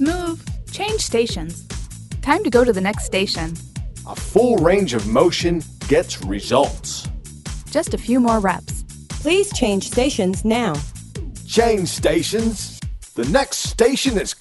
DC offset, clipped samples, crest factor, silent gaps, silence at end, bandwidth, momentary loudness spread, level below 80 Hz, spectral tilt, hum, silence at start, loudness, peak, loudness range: under 0.1%; under 0.1%; 18 dB; none; 0.05 s; 12 kHz; 16 LU; -34 dBFS; -4.5 dB/octave; none; 0 s; -19 LUFS; -2 dBFS; 2 LU